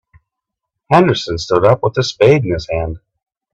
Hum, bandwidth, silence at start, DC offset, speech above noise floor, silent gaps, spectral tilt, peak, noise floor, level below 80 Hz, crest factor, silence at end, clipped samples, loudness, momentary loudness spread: none; 8.4 kHz; 0.9 s; under 0.1%; 66 dB; none; -6 dB/octave; 0 dBFS; -79 dBFS; -40 dBFS; 16 dB; 0.55 s; under 0.1%; -14 LUFS; 10 LU